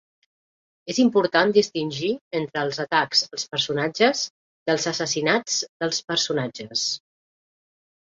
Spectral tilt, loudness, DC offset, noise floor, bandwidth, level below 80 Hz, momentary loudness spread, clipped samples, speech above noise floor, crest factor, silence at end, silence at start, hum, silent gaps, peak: -3 dB/octave; -23 LUFS; under 0.1%; under -90 dBFS; 7.8 kHz; -68 dBFS; 9 LU; under 0.1%; over 67 dB; 20 dB; 1.15 s; 0.85 s; none; 2.21-2.31 s, 4.30-4.66 s, 5.69-5.80 s; -6 dBFS